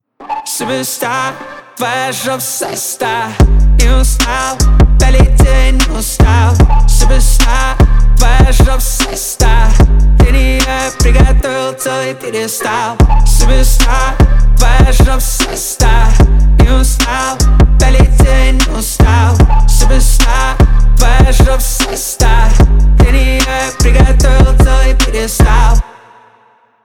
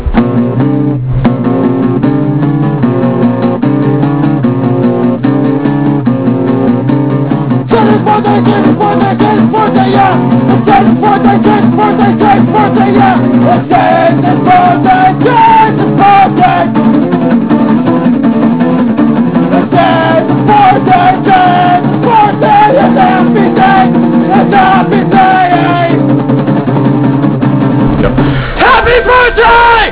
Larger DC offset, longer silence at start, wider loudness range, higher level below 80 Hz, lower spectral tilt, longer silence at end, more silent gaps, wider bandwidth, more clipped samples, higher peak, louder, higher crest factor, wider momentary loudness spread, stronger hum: second, under 0.1% vs 1%; first, 0.2 s vs 0 s; about the same, 2 LU vs 3 LU; first, -8 dBFS vs -28 dBFS; second, -4.5 dB/octave vs -11 dB/octave; first, 1 s vs 0 s; neither; first, 17 kHz vs 4 kHz; second, under 0.1% vs 2%; about the same, 0 dBFS vs 0 dBFS; second, -11 LUFS vs -7 LUFS; about the same, 8 dB vs 6 dB; about the same, 7 LU vs 5 LU; neither